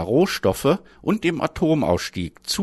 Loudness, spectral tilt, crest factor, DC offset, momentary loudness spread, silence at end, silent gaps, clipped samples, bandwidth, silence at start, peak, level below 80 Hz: -22 LUFS; -5.5 dB/octave; 16 dB; under 0.1%; 6 LU; 0 s; none; under 0.1%; 12.5 kHz; 0 s; -6 dBFS; -46 dBFS